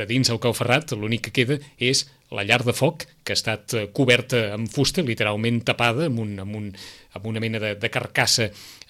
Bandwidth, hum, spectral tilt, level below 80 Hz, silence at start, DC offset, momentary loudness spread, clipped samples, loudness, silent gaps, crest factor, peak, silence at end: 16 kHz; none; -4 dB/octave; -54 dBFS; 0 s; under 0.1%; 12 LU; under 0.1%; -22 LUFS; none; 20 dB; -4 dBFS; 0.15 s